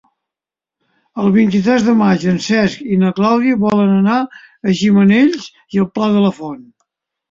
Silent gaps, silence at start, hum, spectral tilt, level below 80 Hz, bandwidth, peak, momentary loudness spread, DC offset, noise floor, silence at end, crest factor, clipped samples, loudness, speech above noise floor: none; 1.15 s; none; -7 dB/octave; -52 dBFS; 7.6 kHz; -2 dBFS; 12 LU; under 0.1%; -87 dBFS; 0.7 s; 12 dB; under 0.1%; -14 LUFS; 74 dB